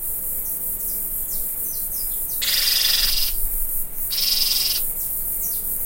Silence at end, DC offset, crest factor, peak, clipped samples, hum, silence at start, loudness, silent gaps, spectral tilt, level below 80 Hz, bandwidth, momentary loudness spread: 0 s; under 0.1%; 18 dB; -4 dBFS; under 0.1%; none; 0 s; -20 LUFS; none; 1 dB/octave; -34 dBFS; 16.5 kHz; 7 LU